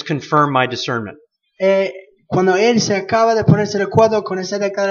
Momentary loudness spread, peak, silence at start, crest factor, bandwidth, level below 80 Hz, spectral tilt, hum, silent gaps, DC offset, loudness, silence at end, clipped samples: 8 LU; 0 dBFS; 0 s; 16 dB; 7.4 kHz; -52 dBFS; -5.5 dB/octave; none; none; under 0.1%; -16 LUFS; 0 s; under 0.1%